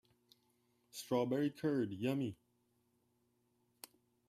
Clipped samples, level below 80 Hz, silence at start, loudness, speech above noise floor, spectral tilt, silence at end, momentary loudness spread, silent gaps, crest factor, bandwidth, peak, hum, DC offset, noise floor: under 0.1%; -82 dBFS; 0.95 s; -38 LUFS; 42 dB; -6.5 dB/octave; 1.95 s; 21 LU; none; 20 dB; 15.5 kHz; -22 dBFS; none; under 0.1%; -79 dBFS